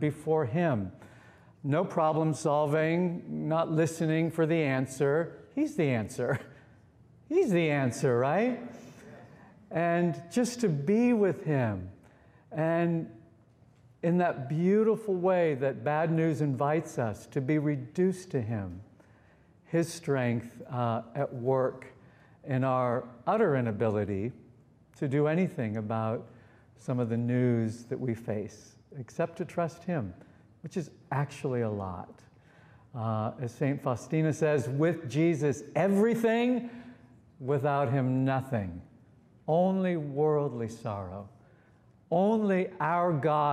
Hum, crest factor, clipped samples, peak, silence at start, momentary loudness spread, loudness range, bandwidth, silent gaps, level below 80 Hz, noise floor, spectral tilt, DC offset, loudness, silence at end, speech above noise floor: none; 16 dB; under 0.1%; -14 dBFS; 0 s; 12 LU; 5 LU; 14.5 kHz; none; -68 dBFS; -61 dBFS; -7.5 dB/octave; under 0.1%; -30 LUFS; 0 s; 32 dB